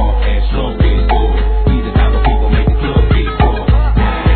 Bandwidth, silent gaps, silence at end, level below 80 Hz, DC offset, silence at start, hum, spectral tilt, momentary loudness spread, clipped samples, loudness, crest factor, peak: 4.5 kHz; none; 0 s; -12 dBFS; 0.5%; 0 s; none; -11 dB/octave; 3 LU; under 0.1%; -14 LUFS; 10 dB; 0 dBFS